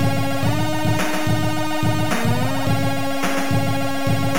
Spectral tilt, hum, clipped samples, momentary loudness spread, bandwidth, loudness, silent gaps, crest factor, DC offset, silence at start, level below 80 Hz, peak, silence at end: -5.5 dB/octave; none; under 0.1%; 2 LU; 17 kHz; -21 LUFS; none; 12 dB; 7%; 0 s; -40 dBFS; -8 dBFS; 0 s